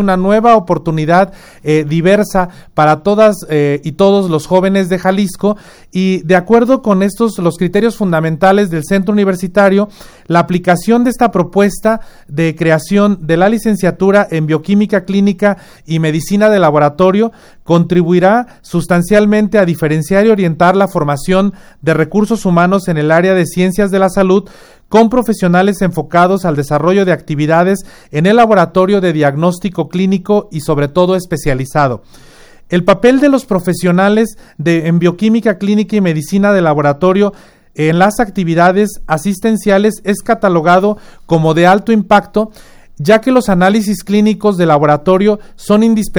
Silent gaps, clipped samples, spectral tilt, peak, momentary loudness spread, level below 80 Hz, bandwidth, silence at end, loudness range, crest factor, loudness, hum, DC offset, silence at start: none; 0.2%; -6.5 dB/octave; 0 dBFS; 7 LU; -36 dBFS; over 20 kHz; 0 s; 1 LU; 10 dB; -11 LUFS; none; under 0.1%; 0 s